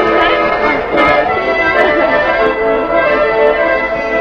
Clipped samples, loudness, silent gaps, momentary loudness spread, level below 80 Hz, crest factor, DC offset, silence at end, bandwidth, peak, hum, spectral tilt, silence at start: under 0.1%; -11 LUFS; none; 3 LU; -36 dBFS; 12 dB; under 0.1%; 0 s; 7.6 kHz; 0 dBFS; none; -5.5 dB/octave; 0 s